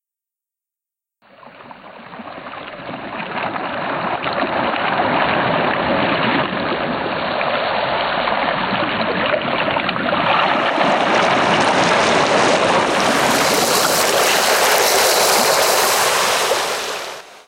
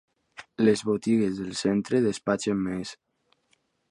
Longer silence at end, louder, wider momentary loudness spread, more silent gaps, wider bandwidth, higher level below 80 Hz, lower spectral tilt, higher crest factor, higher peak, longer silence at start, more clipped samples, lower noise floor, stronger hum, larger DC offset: second, 0.05 s vs 0.95 s; first, -16 LUFS vs -26 LUFS; about the same, 11 LU vs 13 LU; neither; first, 16 kHz vs 11.5 kHz; first, -52 dBFS vs -62 dBFS; second, -2.5 dB/octave vs -5.5 dB/octave; about the same, 14 dB vs 18 dB; first, -2 dBFS vs -8 dBFS; first, 1.45 s vs 0.4 s; neither; first, -87 dBFS vs -70 dBFS; neither; neither